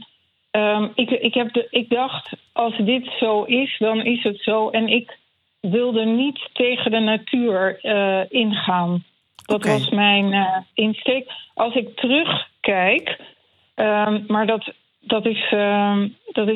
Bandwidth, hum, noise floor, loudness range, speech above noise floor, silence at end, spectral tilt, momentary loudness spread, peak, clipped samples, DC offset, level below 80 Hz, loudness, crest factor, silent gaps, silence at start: 11.5 kHz; none; -60 dBFS; 2 LU; 40 dB; 0 s; -6 dB/octave; 7 LU; -4 dBFS; under 0.1%; under 0.1%; -70 dBFS; -20 LUFS; 16 dB; none; 0 s